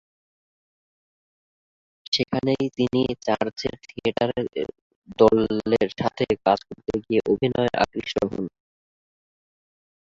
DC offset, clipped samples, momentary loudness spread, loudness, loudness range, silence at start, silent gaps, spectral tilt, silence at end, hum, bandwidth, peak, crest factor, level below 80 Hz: under 0.1%; under 0.1%; 11 LU; -24 LUFS; 4 LU; 2.1 s; 4.82-5.02 s; -6 dB/octave; 1.6 s; none; 7.6 kHz; -4 dBFS; 22 dB; -52 dBFS